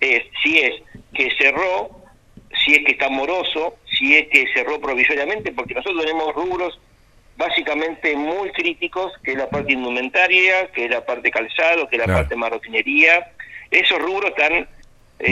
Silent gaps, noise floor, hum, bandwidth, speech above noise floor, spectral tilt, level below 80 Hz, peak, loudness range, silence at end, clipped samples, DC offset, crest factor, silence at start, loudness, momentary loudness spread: none; -51 dBFS; none; 14.5 kHz; 32 dB; -4.5 dB/octave; -44 dBFS; 0 dBFS; 6 LU; 0 s; under 0.1%; under 0.1%; 20 dB; 0 s; -17 LUFS; 12 LU